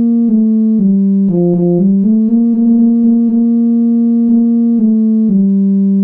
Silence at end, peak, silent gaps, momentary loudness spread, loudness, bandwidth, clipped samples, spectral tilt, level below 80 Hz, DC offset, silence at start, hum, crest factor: 0 s; -2 dBFS; none; 1 LU; -10 LUFS; 1.2 kHz; under 0.1%; -14.5 dB/octave; -56 dBFS; under 0.1%; 0 s; none; 8 dB